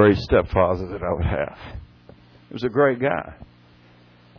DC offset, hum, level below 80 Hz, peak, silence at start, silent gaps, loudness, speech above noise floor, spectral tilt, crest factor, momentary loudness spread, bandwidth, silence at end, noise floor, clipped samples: under 0.1%; 60 Hz at -50 dBFS; -38 dBFS; -6 dBFS; 0 s; none; -22 LUFS; 31 dB; -8.5 dB/octave; 18 dB; 20 LU; 5.4 kHz; 0.95 s; -52 dBFS; under 0.1%